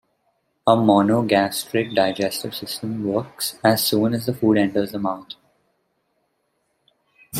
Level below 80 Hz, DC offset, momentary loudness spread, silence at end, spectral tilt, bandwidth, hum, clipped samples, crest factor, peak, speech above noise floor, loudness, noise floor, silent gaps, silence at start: -62 dBFS; under 0.1%; 11 LU; 0 s; -5 dB/octave; 16 kHz; none; under 0.1%; 20 dB; -2 dBFS; 51 dB; -20 LUFS; -71 dBFS; none; 0.65 s